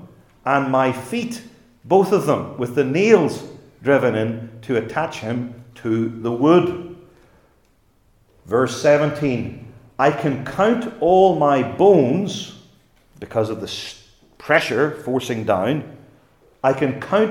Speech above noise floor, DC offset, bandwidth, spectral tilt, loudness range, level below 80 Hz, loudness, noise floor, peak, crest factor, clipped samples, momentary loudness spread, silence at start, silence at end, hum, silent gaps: 40 dB; under 0.1%; 17.5 kHz; -6 dB/octave; 5 LU; -56 dBFS; -19 LUFS; -59 dBFS; 0 dBFS; 20 dB; under 0.1%; 17 LU; 0 s; 0 s; none; none